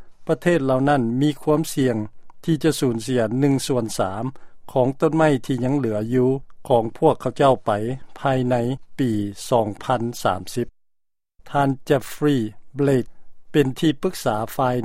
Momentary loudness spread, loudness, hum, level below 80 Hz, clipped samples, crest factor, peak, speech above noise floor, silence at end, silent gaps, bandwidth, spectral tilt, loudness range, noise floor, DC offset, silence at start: 8 LU; -22 LUFS; none; -50 dBFS; under 0.1%; 18 dB; -2 dBFS; 51 dB; 0 s; none; 16 kHz; -6.5 dB/octave; 3 LU; -71 dBFS; under 0.1%; 0 s